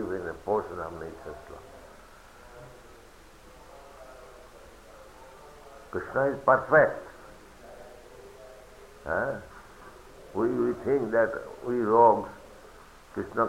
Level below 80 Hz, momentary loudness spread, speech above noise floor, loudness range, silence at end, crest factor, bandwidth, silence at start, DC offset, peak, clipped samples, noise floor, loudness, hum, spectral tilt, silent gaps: -56 dBFS; 28 LU; 26 dB; 23 LU; 0 s; 22 dB; 16 kHz; 0 s; under 0.1%; -8 dBFS; under 0.1%; -52 dBFS; -27 LUFS; none; -7 dB/octave; none